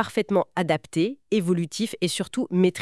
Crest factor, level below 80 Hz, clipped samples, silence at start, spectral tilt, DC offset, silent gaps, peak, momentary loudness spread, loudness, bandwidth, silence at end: 18 dB; -66 dBFS; under 0.1%; 0 s; -5.5 dB/octave; 0.1%; none; -6 dBFS; 4 LU; -25 LUFS; 12 kHz; 0 s